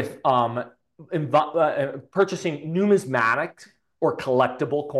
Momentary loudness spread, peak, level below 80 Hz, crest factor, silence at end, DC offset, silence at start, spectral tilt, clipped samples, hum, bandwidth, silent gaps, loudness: 9 LU; -6 dBFS; -68 dBFS; 18 dB; 0 s; under 0.1%; 0 s; -6 dB/octave; under 0.1%; none; 12.5 kHz; none; -23 LUFS